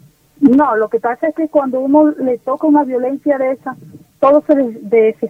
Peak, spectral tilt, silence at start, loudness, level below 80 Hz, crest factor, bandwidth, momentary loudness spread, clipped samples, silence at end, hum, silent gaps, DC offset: 0 dBFS; -8.5 dB/octave; 0.4 s; -14 LUFS; -58 dBFS; 14 dB; 3.7 kHz; 7 LU; under 0.1%; 0 s; none; none; under 0.1%